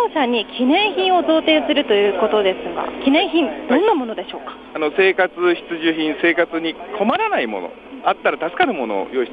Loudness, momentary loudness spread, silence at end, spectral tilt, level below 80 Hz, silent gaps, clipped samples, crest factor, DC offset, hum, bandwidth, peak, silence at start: -18 LUFS; 9 LU; 0 s; -6.5 dB/octave; -56 dBFS; none; under 0.1%; 16 dB; under 0.1%; none; 5 kHz; -2 dBFS; 0 s